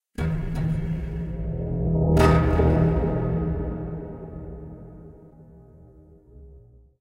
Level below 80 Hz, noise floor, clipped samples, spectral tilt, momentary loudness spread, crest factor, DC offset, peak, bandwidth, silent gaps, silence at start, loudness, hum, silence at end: -32 dBFS; -50 dBFS; under 0.1%; -8.5 dB/octave; 21 LU; 18 dB; under 0.1%; -6 dBFS; 12 kHz; none; 0.2 s; -24 LUFS; none; 0.4 s